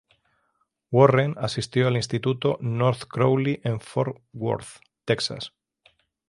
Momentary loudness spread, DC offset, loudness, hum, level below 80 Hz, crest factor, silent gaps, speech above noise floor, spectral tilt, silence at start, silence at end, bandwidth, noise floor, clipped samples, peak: 13 LU; under 0.1%; -24 LUFS; none; -60 dBFS; 22 dB; none; 49 dB; -6.5 dB/octave; 0.9 s; 0.8 s; 11.5 kHz; -72 dBFS; under 0.1%; -2 dBFS